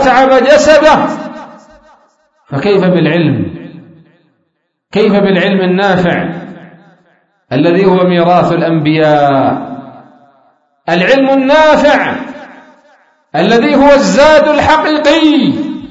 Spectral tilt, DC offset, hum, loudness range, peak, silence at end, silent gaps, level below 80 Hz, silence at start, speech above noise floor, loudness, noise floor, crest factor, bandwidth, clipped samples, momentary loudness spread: -6 dB/octave; under 0.1%; none; 5 LU; 0 dBFS; 0 s; none; -40 dBFS; 0 s; 57 dB; -9 LUFS; -65 dBFS; 10 dB; 8 kHz; 0.4%; 16 LU